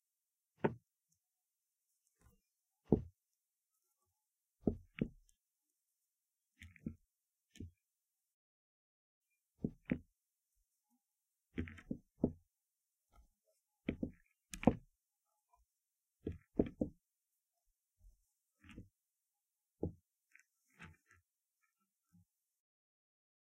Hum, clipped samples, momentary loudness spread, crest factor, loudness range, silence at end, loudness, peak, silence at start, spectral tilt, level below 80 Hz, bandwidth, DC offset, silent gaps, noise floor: none; under 0.1%; 22 LU; 36 dB; 15 LU; 2.7 s; -43 LUFS; -12 dBFS; 0.65 s; -7.5 dB/octave; -62 dBFS; 15 kHz; under 0.1%; 8.34-9.22 s; under -90 dBFS